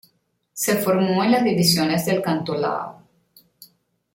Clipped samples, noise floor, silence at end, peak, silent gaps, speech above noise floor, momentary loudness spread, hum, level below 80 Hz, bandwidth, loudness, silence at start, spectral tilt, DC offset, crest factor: under 0.1%; -67 dBFS; 0.5 s; -4 dBFS; none; 47 dB; 10 LU; none; -60 dBFS; 17 kHz; -20 LUFS; 0.55 s; -4.5 dB/octave; under 0.1%; 18 dB